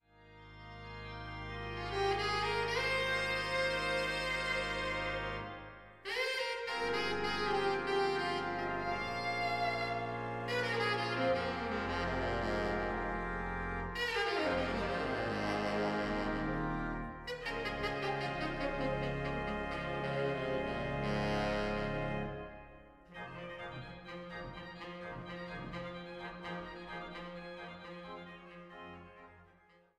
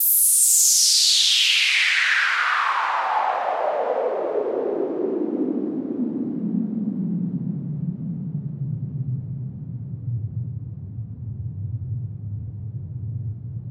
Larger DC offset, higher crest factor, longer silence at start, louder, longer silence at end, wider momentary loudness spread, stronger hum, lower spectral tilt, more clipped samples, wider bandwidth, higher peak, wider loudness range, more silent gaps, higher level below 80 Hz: neither; about the same, 16 dB vs 20 dB; first, 0.2 s vs 0 s; second, -36 LUFS vs -20 LUFS; first, 0.5 s vs 0 s; second, 14 LU vs 19 LU; neither; first, -5 dB/octave vs -2.5 dB/octave; neither; second, 15 kHz vs 19 kHz; second, -22 dBFS vs -4 dBFS; second, 11 LU vs 15 LU; neither; about the same, -52 dBFS vs -54 dBFS